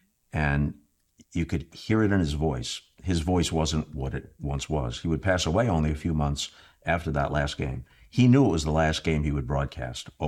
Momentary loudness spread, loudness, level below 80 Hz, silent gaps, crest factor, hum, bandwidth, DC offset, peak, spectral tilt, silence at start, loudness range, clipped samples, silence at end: 11 LU; -27 LUFS; -40 dBFS; none; 18 dB; none; 13.5 kHz; under 0.1%; -10 dBFS; -6 dB/octave; 0.35 s; 3 LU; under 0.1%; 0 s